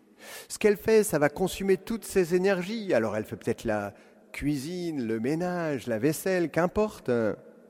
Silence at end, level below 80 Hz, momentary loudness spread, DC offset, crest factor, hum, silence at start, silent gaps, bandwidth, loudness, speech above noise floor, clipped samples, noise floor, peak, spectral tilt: 0.2 s; -54 dBFS; 9 LU; under 0.1%; 20 dB; none; 0.2 s; none; 17 kHz; -28 LUFS; 20 dB; under 0.1%; -47 dBFS; -8 dBFS; -5.5 dB/octave